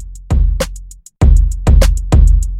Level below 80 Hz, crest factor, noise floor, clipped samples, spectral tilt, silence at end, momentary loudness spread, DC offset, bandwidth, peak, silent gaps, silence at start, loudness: -12 dBFS; 10 dB; -31 dBFS; under 0.1%; -6.5 dB/octave; 0 s; 10 LU; under 0.1%; 12.5 kHz; 0 dBFS; none; 0 s; -14 LUFS